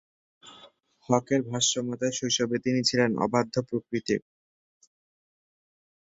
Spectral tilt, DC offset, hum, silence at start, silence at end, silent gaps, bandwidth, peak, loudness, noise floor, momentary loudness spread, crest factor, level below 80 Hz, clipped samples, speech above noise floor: -3.5 dB/octave; under 0.1%; none; 0.45 s; 1.95 s; none; 8 kHz; -8 dBFS; -27 LUFS; -56 dBFS; 7 LU; 22 dB; -66 dBFS; under 0.1%; 30 dB